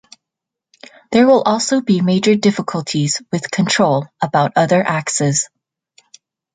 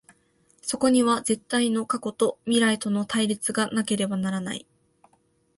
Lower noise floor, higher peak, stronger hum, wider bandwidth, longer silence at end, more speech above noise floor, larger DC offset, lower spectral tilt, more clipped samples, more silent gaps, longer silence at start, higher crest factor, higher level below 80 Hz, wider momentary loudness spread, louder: first, -83 dBFS vs -66 dBFS; first, -2 dBFS vs -8 dBFS; neither; second, 9.6 kHz vs 11.5 kHz; about the same, 1.1 s vs 1 s; first, 68 dB vs 42 dB; neither; about the same, -4.5 dB/octave vs -4 dB/octave; neither; neither; first, 1.1 s vs 0.65 s; about the same, 14 dB vs 18 dB; first, -60 dBFS vs -66 dBFS; about the same, 8 LU vs 9 LU; first, -15 LUFS vs -25 LUFS